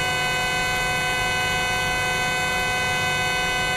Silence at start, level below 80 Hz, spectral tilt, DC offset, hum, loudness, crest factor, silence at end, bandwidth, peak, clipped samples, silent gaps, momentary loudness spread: 0 s; -40 dBFS; -2 dB/octave; under 0.1%; none; -21 LUFS; 12 dB; 0 s; 16 kHz; -10 dBFS; under 0.1%; none; 0 LU